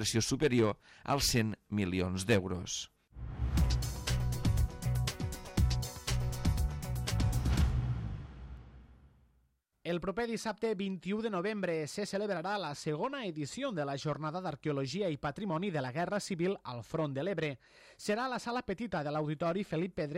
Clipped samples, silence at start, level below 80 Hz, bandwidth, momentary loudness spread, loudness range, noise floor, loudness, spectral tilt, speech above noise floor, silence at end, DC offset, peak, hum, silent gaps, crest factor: under 0.1%; 0 s; -42 dBFS; 16.5 kHz; 8 LU; 4 LU; -74 dBFS; -35 LUFS; -5 dB/octave; 39 dB; 0 s; under 0.1%; -14 dBFS; none; none; 20 dB